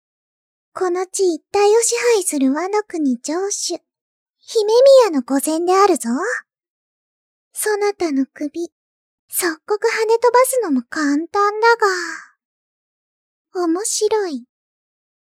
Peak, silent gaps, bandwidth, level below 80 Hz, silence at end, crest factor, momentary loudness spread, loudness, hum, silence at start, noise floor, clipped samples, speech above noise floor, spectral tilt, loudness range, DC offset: -2 dBFS; 4.01-4.34 s, 6.69-7.51 s, 8.72-9.28 s, 12.45-13.45 s; 16.5 kHz; -72 dBFS; 0.85 s; 16 dB; 13 LU; -17 LUFS; none; 0.75 s; under -90 dBFS; under 0.1%; over 73 dB; -1.5 dB/octave; 7 LU; under 0.1%